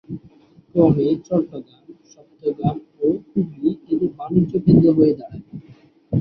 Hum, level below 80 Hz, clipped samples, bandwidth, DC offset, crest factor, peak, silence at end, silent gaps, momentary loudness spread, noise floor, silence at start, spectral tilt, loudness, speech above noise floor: none; -48 dBFS; under 0.1%; 6.2 kHz; under 0.1%; 18 dB; -2 dBFS; 0 s; none; 21 LU; -51 dBFS; 0.1 s; -11 dB/octave; -19 LUFS; 32 dB